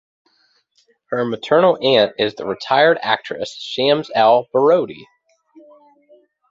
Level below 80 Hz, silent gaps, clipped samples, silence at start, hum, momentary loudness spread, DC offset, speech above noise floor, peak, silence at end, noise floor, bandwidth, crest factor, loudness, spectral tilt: -64 dBFS; none; under 0.1%; 1.1 s; none; 12 LU; under 0.1%; 45 dB; -2 dBFS; 1.5 s; -61 dBFS; 7.8 kHz; 16 dB; -17 LUFS; -5 dB/octave